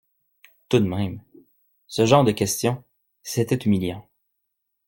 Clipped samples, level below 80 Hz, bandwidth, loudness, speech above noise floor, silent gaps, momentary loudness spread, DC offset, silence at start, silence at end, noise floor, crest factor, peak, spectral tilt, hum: under 0.1%; -58 dBFS; 17 kHz; -22 LUFS; 56 dB; none; 17 LU; under 0.1%; 0.7 s; 0.85 s; -77 dBFS; 22 dB; -2 dBFS; -5.5 dB/octave; none